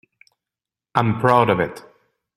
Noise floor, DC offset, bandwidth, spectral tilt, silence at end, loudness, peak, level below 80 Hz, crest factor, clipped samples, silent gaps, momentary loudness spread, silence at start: -89 dBFS; under 0.1%; 13 kHz; -7.5 dB/octave; 0.55 s; -19 LUFS; 0 dBFS; -56 dBFS; 22 dB; under 0.1%; none; 9 LU; 0.95 s